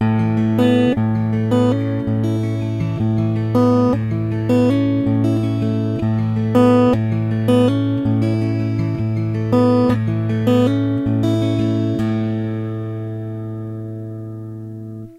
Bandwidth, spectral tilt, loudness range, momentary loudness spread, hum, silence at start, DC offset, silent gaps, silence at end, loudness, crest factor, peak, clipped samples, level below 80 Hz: 11 kHz; -9 dB/octave; 4 LU; 13 LU; none; 0 s; under 0.1%; none; 0 s; -18 LUFS; 14 dB; -2 dBFS; under 0.1%; -44 dBFS